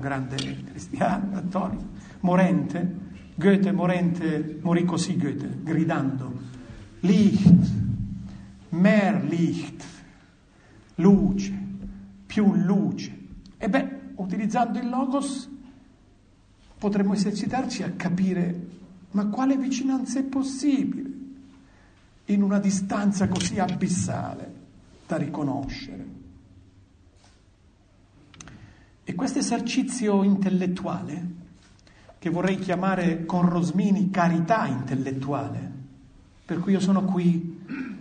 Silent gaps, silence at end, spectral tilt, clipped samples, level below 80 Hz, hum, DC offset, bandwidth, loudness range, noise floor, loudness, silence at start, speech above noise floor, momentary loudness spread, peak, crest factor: none; 0 s; -6.5 dB/octave; under 0.1%; -50 dBFS; none; under 0.1%; 9.6 kHz; 7 LU; -57 dBFS; -25 LUFS; 0 s; 34 dB; 18 LU; -4 dBFS; 22 dB